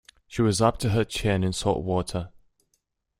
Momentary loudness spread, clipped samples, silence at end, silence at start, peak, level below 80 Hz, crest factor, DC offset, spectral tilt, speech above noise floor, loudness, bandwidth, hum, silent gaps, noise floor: 12 LU; under 0.1%; 0.9 s; 0.3 s; -6 dBFS; -46 dBFS; 20 dB; under 0.1%; -5.5 dB/octave; 50 dB; -25 LUFS; 15.5 kHz; none; none; -74 dBFS